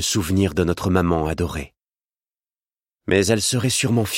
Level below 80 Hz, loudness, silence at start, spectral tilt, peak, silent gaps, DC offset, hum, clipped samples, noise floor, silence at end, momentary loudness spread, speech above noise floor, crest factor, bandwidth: -40 dBFS; -20 LUFS; 0 s; -4.5 dB/octave; -2 dBFS; none; under 0.1%; none; under 0.1%; under -90 dBFS; 0 s; 10 LU; over 70 dB; 20 dB; 16.5 kHz